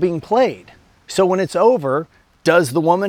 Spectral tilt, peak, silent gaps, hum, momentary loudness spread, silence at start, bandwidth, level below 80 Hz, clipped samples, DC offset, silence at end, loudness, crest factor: -5.5 dB/octave; -2 dBFS; none; none; 9 LU; 0 s; 16 kHz; -56 dBFS; under 0.1%; under 0.1%; 0 s; -17 LUFS; 16 dB